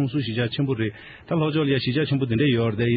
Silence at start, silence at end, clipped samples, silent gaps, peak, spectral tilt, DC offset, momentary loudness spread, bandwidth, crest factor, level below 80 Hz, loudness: 0 s; 0 s; under 0.1%; none; -10 dBFS; -5.5 dB/octave; under 0.1%; 7 LU; 5.2 kHz; 12 dB; -54 dBFS; -23 LUFS